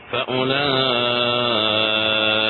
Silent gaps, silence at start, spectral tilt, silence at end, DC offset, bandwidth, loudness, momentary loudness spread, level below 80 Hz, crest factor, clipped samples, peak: none; 0 s; -7 dB/octave; 0 s; under 0.1%; 5 kHz; -18 LUFS; 3 LU; -56 dBFS; 16 dB; under 0.1%; -4 dBFS